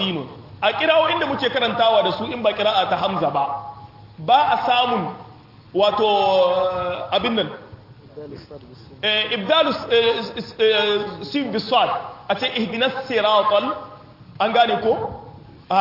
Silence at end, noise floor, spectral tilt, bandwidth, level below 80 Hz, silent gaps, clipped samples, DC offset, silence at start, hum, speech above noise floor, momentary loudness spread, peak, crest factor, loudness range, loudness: 0 s; -43 dBFS; -5.5 dB/octave; 5.8 kHz; -58 dBFS; none; under 0.1%; under 0.1%; 0 s; none; 23 dB; 14 LU; -4 dBFS; 16 dB; 2 LU; -19 LUFS